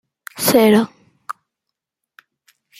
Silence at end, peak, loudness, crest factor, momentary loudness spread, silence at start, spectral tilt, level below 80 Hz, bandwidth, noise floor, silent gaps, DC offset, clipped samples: 1.5 s; 0 dBFS; -15 LUFS; 20 dB; 22 LU; 0.35 s; -4.5 dB/octave; -62 dBFS; 16 kHz; -81 dBFS; none; under 0.1%; under 0.1%